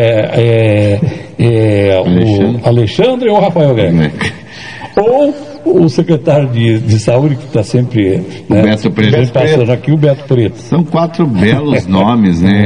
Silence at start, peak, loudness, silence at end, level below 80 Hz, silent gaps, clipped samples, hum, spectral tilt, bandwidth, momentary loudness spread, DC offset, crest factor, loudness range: 0 s; 0 dBFS; -10 LUFS; 0 s; -42 dBFS; none; 0.6%; none; -7.5 dB/octave; 10 kHz; 5 LU; 0.9%; 10 dB; 1 LU